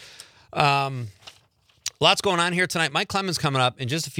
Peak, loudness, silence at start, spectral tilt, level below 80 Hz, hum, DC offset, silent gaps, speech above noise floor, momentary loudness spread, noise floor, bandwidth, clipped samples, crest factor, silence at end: -2 dBFS; -22 LUFS; 0 s; -3.5 dB/octave; -62 dBFS; none; under 0.1%; none; 38 dB; 15 LU; -61 dBFS; 17 kHz; under 0.1%; 22 dB; 0 s